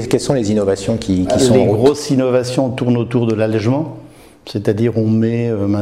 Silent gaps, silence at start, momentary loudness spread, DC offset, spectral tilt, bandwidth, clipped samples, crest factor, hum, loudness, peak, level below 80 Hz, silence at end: none; 0 s; 6 LU; 0.2%; -6.5 dB/octave; 14 kHz; under 0.1%; 14 dB; none; -15 LUFS; 0 dBFS; -44 dBFS; 0 s